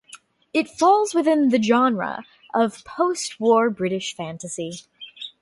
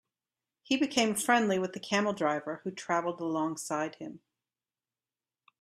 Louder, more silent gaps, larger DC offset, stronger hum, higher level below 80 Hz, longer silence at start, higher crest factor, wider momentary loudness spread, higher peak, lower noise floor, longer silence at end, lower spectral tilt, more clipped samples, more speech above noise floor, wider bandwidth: first, -21 LUFS vs -30 LUFS; neither; neither; neither; first, -66 dBFS vs -76 dBFS; second, 0.15 s vs 0.7 s; second, 16 dB vs 24 dB; first, 16 LU vs 12 LU; about the same, -6 dBFS vs -8 dBFS; second, -48 dBFS vs under -90 dBFS; second, 0.15 s vs 1.45 s; about the same, -4.5 dB/octave vs -3.5 dB/octave; neither; second, 28 dB vs over 59 dB; second, 11.5 kHz vs 15.5 kHz